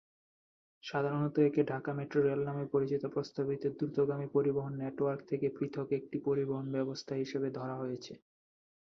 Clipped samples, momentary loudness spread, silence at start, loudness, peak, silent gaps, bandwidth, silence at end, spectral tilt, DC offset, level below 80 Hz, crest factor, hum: under 0.1%; 8 LU; 0.85 s; -35 LUFS; -16 dBFS; none; 6.6 kHz; 0.65 s; -8 dB/octave; under 0.1%; -74 dBFS; 18 dB; none